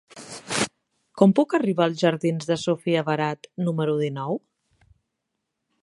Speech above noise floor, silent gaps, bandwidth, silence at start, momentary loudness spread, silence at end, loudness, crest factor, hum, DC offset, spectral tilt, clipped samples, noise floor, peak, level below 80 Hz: 58 dB; none; 11.5 kHz; 0.15 s; 10 LU; 1.45 s; -24 LUFS; 22 dB; none; under 0.1%; -5.5 dB/octave; under 0.1%; -80 dBFS; -2 dBFS; -66 dBFS